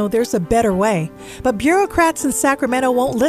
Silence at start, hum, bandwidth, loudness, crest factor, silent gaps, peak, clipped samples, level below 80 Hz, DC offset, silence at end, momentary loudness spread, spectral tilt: 0 s; none; 15.5 kHz; -17 LUFS; 14 dB; none; -2 dBFS; under 0.1%; -40 dBFS; 0.1%; 0 s; 6 LU; -4.5 dB/octave